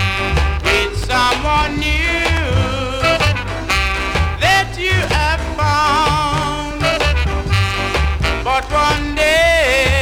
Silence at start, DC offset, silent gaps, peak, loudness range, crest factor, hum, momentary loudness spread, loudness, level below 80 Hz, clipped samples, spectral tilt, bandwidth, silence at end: 0 s; under 0.1%; none; -2 dBFS; 1 LU; 14 dB; none; 5 LU; -15 LUFS; -22 dBFS; under 0.1%; -4.5 dB/octave; 17.5 kHz; 0 s